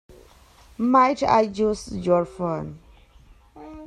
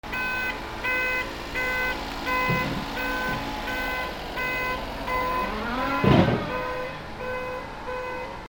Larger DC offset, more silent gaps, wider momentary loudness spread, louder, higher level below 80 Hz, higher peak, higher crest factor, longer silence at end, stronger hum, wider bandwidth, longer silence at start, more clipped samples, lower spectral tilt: neither; neither; first, 13 LU vs 9 LU; first, -22 LUFS vs -27 LUFS; second, -50 dBFS vs -42 dBFS; about the same, -6 dBFS vs -4 dBFS; second, 18 dB vs 24 dB; about the same, 0 s vs 0 s; neither; second, 12 kHz vs over 20 kHz; first, 0.8 s vs 0.05 s; neither; about the same, -6.5 dB/octave vs -5.5 dB/octave